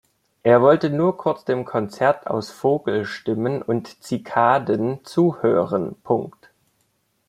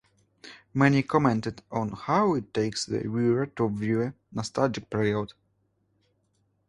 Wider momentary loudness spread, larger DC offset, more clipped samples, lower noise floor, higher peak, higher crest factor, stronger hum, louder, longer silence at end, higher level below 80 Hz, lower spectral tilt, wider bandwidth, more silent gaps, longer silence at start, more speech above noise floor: about the same, 9 LU vs 10 LU; neither; neither; about the same, -68 dBFS vs -71 dBFS; first, -2 dBFS vs -6 dBFS; about the same, 18 dB vs 22 dB; neither; first, -21 LUFS vs -27 LUFS; second, 1 s vs 1.4 s; about the same, -64 dBFS vs -60 dBFS; about the same, -7.5 dB/octave vs -6.5 dB/octave; first, 13.5 kHz vs 11.5 kHz; neither; about the same, 0.45 s vs 0.45 s; about the same, 48 dB vs 45 dB